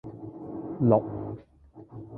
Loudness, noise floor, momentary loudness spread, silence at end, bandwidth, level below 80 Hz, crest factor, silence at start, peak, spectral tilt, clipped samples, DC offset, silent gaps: -27 LUFS; -52 dBFS; 21 LU; 0 s; 3.3 kHz; -58 dBFS; 24 dB; 0.05 s; -6 dBFS; -13.5 dB/octave; under 0.1%; under 0.1%; none